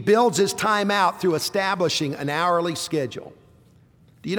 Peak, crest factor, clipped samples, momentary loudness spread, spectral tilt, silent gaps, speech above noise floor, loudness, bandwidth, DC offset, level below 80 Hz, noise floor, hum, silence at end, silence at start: -8 dBFS; 16 dB; under 0.1%; 8 LU; -4 dB/octave; none; 32 dB; -22 LUFS; over 20 kHz; under 0.1%; -64 dBFS; -54 dBFS; none; 0 s; 0 s